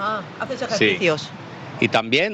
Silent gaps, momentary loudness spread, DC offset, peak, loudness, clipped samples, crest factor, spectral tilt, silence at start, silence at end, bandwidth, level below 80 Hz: none; 17 LU; under 0.1%; -4 dBFS; -21 LUFS; under 0.1%; 18 dB; -4.5 dB/octave; 0 s; 0 s; 8.8 kHz; -62 dBFS